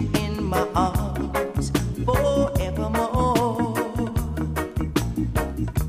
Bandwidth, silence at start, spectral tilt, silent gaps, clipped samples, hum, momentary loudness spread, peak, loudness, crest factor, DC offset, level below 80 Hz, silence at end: 15.5 kHz; 0 s; -6.5 dB/octave; none; under 0.1%; none; 5 LU; -8 dBFS; -24 LUFS; 16 dB; under 0.1%; -32 dBFS; 0 s